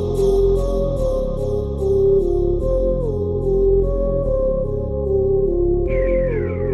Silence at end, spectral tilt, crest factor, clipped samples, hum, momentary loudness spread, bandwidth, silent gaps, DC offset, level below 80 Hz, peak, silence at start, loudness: 0 s; -9 dB/octave; 10 dB; under 0.1%; none; 6 LU; 11.5 kHz; none; under 0.1%; -24 dBFS; -6 dBFS; 0 s; -19 LUFS